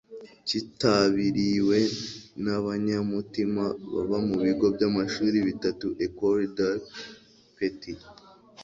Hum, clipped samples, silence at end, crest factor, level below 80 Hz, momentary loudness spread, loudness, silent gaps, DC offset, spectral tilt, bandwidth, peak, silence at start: none; under 0.1%; 0 s; 20 dB; -58 dBFS; 13 LU; -27 LUFS; none; under 0.1%; -6 dB/octave; 7.8 kHz; -8 dBFS; 0.1 s